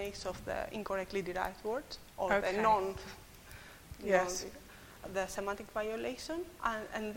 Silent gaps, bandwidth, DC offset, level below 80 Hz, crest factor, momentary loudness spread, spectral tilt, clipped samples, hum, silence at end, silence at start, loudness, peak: none; 16.5 kHz; under 0.1%; -58 dBFS; 24 dB; 21 LU; -4 dB/octave; under 0.1%; none; 0 s; 0 s; -36 LUFS; -12 dBFS